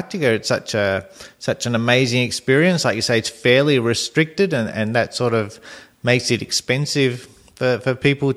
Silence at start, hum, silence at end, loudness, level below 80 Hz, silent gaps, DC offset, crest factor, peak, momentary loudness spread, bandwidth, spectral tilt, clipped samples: 0 s; none; 0 s; -19 LUFS; -56 dBFS; none; under 0.1%; 18 dB; -2 dBFS; 8 LU; 14.5 kHz; -4.5 dB/octave; under 0.1%